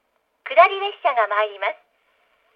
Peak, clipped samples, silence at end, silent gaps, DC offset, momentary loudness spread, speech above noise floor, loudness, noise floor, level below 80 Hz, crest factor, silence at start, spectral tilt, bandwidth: 0 dBFS; under 0.1%; 0.8 s; none; under 0.1%; 16 LU; 45 dB; -19 LUFS; -64 dBFS; -88 dBFS; 22 dB; 0.45 s; -1.5 dB/octave; 5.2 kHz